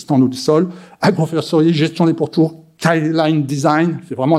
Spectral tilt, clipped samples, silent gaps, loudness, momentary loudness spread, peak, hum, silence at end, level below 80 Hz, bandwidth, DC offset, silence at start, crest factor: -6.5 dB/octave; under 0.1%; none; -16 LUFS; 5 LU; 0 dBFS; none; 0 s; -62 dBFS; 13.5 kHz; under 0.1%; 0 s; 14 dB